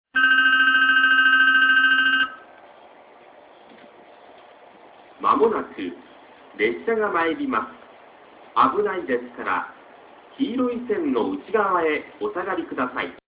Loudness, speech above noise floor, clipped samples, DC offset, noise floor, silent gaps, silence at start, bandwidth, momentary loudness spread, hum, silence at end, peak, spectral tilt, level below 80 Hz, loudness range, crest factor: -20 LUFS; 25 dB; under 0.1%; under 0.1%; -48 dBFS; none; 0.15 s; 4 kHz; 13 LU; none; 0.15 s; -4 dBFS; -6.5 dB/octave; -64 dBFS; 10 LU; 18 dB